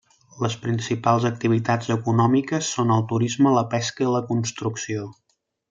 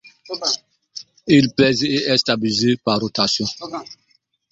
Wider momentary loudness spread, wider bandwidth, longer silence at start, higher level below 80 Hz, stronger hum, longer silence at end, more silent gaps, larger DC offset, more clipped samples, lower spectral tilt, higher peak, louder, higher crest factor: second, 9 LU vs 17 LU; about the same, 7.8 kHz vs 7.8 kHz; first, 0.35 s vs 0.05 s; second, -64 dBFS vs -56 dBFS; neither; about the same, 0.6 s vs 0.55 s; neither; neither; neither; about the same, -5.5 dB/octave vs -4.5 dB/octave; second, -4 dBFS vs 0 dBFS; second, -22 LUFS vs -18 LUFS; about the same, 18 dB vs 20 dB